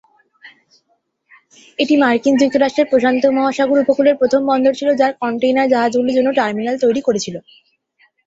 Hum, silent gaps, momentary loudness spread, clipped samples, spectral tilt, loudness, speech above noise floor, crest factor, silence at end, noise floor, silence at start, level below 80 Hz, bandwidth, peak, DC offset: none; none; 6 LU; under 0.1%; -4.5 dB/octave; -15 LUFS; 50 dB; 14 dB; 0.85 s; -65 dBFS; 0.45 s; -60 dBFS; 8 kHz; -2 dBFS; under 0.1%